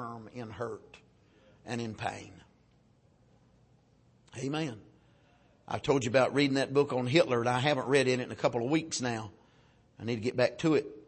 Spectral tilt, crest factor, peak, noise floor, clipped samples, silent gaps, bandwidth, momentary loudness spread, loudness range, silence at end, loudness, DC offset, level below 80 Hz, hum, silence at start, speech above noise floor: -5 dB/octave; 22 dB; -10 dBFS; -65 dBFS; under 0.1%; none; 8.8 kHz; 16 LU; 15 LU; 0.05 s; -30 LUFS; under 0.1%; -68 dBFS; none; 0 s; 35 dB